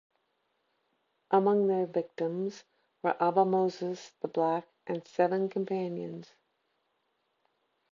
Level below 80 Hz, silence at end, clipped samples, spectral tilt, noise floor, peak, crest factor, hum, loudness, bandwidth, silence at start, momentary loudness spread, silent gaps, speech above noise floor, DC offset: -86 dBFS; 1.7 s; under 0.1%; -7.5 dB/octave; -78 dBFS; -12 dBFS; 20 dB; none; -30 LUFS; 7.4 kHz; 1.3 s; 12 LU; none; 48 dB; under 0.1%